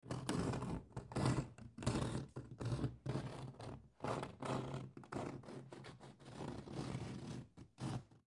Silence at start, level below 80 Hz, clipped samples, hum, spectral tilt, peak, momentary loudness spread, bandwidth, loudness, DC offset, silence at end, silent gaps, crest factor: 0.05 s; -60 dBFS; under 0.1%; none; -6 dB/octave; -22 dBFS; 13 LU; 11.5 kHz; -45 LUFS; under 0.1%; 0.15 s; none; 22 dB